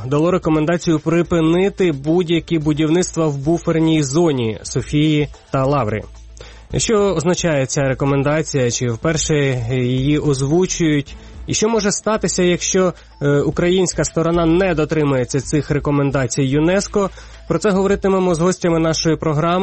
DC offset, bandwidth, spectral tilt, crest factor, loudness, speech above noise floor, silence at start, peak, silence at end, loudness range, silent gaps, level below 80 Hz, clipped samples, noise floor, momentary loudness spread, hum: under 0.1%; 8.8 kHz; -5.5 dB/octave; 10 dB; -17 LUFS; 21 dB; 0 s; -6 dBFS; 0 s; 2 LU; none; -38 dBFS; under 0.1%; -37 dBFS; 4 LU; none